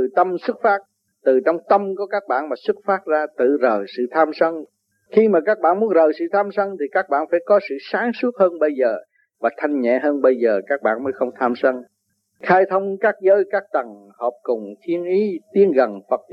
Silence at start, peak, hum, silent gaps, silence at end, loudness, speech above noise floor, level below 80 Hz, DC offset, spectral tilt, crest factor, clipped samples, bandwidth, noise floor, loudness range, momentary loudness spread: 0 s; -2 dBFS; none; none; 0.15 s; -19 LUFS; 47 dB; -82 dBFS; under 0.1%; -8 dB/octave; 18 dB; under 0.1%; 5.8 kHz; -66 dBFS; 2 LU; 9 LU